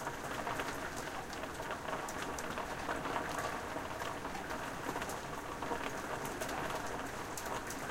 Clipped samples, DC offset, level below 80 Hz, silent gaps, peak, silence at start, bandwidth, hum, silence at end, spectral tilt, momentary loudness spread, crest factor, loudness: under 0.1%; under 0.1%; -56 dBFS; none; -22 dBFS; 0 s; 16.5 kHz; none; 0 s; -3.5 dB/octave; 4 LU; 18 dB; -40 LUFS